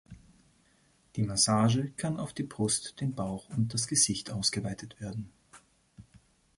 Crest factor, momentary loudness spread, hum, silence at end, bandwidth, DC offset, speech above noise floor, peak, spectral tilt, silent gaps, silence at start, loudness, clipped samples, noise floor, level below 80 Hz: 22 dB; 15 LU; none; 0.4 s; 11.5 kHz; under 0.1%; 36 dB; -10 dBFS; -4 dB/octave; none; 0.1 s; -30 LUFS; under 0.1%; -67 dBFS; -60 dBFS